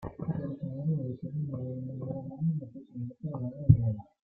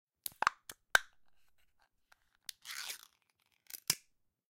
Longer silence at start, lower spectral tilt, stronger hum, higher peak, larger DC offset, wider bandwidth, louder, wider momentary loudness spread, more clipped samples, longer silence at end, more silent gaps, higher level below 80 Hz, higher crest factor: second, 0 s vs 0.25 s; first, -13.5 dB/octave vs 0.5 dB/octave; neither; first, -6 dBFS vs -10 dBFS; neither; second, 2.3 kHz vs 17 kHz; first, -33 LUFS vs -36 LUFS; second, 14 LU vs 18 LU; neither; second, 0.3 s vs 0.55 s; neither; first, -52 dBFS vs -74 dBFS; second, 26 dB vs 32 dB